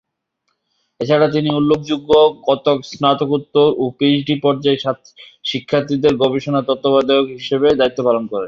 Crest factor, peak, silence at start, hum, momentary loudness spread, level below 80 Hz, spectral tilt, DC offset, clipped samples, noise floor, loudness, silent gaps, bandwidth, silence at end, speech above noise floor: 14 dB; -2 dBFS; 1 s; none; 6 LU; -54 dBFS; -6.5 dB/octave; under 0.1%; under 0.1%; -71 dBFS; -16 LUFS; none; 7.2 kHz; 0 s; 55 dB